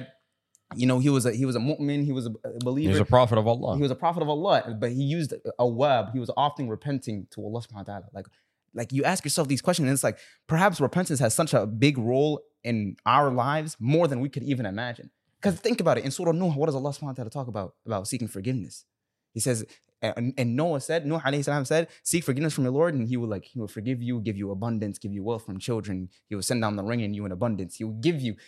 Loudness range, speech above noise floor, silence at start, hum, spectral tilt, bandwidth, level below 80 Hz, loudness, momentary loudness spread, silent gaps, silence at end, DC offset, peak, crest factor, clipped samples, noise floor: 6 LU; 43 dB; 0 s; none; -5.5 dB/octave; 14 kHz; -60 dBFS; -27 LUFS; 12 LU; none; 0.15 s; under 0.1%; -2 dBFS; 24 dB; under 0.1%; -69 dBFS